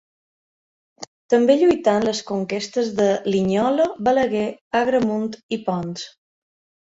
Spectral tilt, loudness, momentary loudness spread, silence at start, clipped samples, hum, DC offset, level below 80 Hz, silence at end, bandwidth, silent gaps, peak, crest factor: -5.5 dB/octave; -20 LUFS; 13 LU; 1 s; under 0.1%; none; under 0.1%; -58 dBFS; 0.8 s; 8 kHz; 1.07-1.29 s, 4.61-4.71 s, 5.43-5.49 s; -4 dBFS; 18 dB